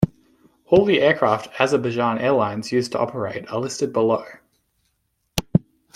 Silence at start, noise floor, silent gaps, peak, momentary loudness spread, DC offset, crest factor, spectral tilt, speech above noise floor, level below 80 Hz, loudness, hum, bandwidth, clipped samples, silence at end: 0 s; -71 dBFS; none; -2 dBFS; 10 LU; under 0.1%; 20 dB; -5.5 dB/octave; 51 dB; -52 dBFS; -21 LUFS; none; 16.5 kHz; under 0.1%; 0.35 s